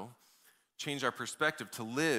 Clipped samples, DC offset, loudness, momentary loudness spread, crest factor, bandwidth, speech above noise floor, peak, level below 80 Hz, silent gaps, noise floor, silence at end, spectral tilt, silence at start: under 0.1%; under 0.1%; -36 LUFS; 9 LU; 20 dB; 16 kHz; 33 dB; -16 dBFS; -80 dBFS; none; -68 dBFS; 0 s; -3.5 dB/octave; 0 s